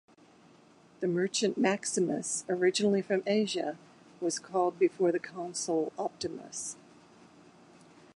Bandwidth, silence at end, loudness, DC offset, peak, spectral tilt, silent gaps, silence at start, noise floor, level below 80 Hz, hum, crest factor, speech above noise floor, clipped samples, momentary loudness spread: 11.5 kHz; 1.4 s; -31 LUFS; under 0.1%; -12 dBFS; -4 dB/octave; none; 1 s; -59 dBFS; -78 dBFS; none; 20 dB; 29 dB; under 0.1%; 10 LU